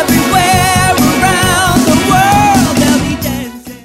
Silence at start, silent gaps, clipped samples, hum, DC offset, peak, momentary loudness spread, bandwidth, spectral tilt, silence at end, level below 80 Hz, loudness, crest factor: 0 s; none; under 0.1%; none; under 0.1%; 0 dBFS; 8 LU; 16.5 kHz; -4 dB/octave; 0.05 s; -28 dBFS; -9 LUFS; 10 dB